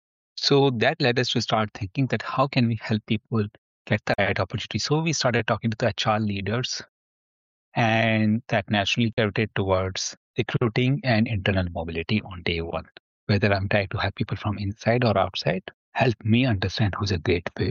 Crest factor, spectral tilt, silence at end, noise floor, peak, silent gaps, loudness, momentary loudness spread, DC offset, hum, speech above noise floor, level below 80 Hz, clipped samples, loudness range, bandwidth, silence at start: 16 dB; -4.5 dB/octave; 0 s; under -90 dBFS; -8 dBFS; 3.58-3.85 s, 6.89-7.72 s, 9.13-9.17 s, 10.17-10.34 s, 13.00-13.27 s, 15.74-15.92 s; -24 LUFS; 8 LU; under 0.1%; none; over 66 dB; -50 dBFS; under 0.1%; 2 LU; 7.6 kHz; 0.35 s